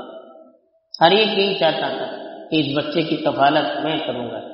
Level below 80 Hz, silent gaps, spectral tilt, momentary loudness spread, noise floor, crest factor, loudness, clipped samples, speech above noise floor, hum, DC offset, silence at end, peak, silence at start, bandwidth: -64 dBFS; none; -2.5 dB/octave; 14 LU; -54 dBFS; 20 dB; -19 LUFS; under 0.1%; 36 dB; none; under 0.1%; 0 s; 0 dBFS; 0 s; 6 kHz